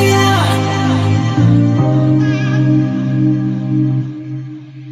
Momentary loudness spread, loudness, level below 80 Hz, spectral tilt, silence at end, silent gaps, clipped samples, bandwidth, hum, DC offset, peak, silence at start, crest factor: 13 LU; -13 LUFS; -44 dBFS; -6.5 dB/octave; 0 s; none; under 0.1%; 14 kHz; none; under 0.1%; 0 dBFS; 0 s; 12 dB